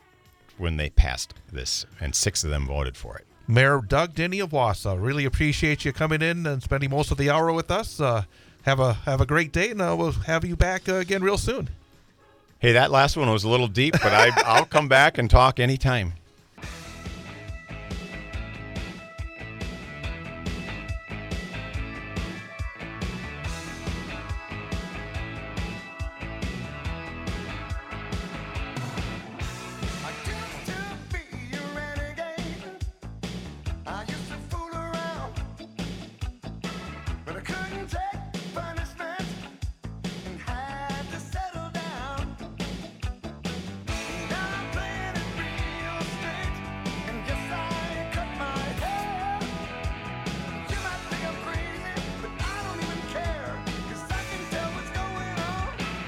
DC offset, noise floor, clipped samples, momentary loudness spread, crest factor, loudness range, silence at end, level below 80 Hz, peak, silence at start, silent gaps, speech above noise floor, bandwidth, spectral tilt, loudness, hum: under 0.1%; -57 dBFS; under 0.1%; 15 LU; 24 dB; 14 LU; 0 s; -36 dBFS; -2 dBFS; 0.6 s; none; 35 dB; 19 kHz; -4.5 dB/octave; -27 LUFS; none